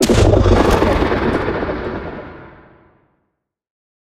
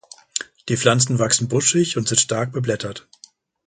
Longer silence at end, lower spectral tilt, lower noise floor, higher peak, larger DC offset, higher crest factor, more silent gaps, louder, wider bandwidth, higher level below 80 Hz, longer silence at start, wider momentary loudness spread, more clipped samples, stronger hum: first, 1.5 s vs 0.65 s; first, -6 dB/octave vs -3.5 dB/octave; first, -72 dBFS vs -51 dBFS; about the same, 0 dBFS vs 0 dBFS; neither; about the same, 16 dB vs 20 dB; neither; first, -15 LUFS vs -19 LUFS; first, 15.5 kHz vs 9.6 kHz; first, -24 dBFS vs -56 dBFS; second, 0 s vs 0.35 s; first, 17 LU vs 12 LU; neither; neither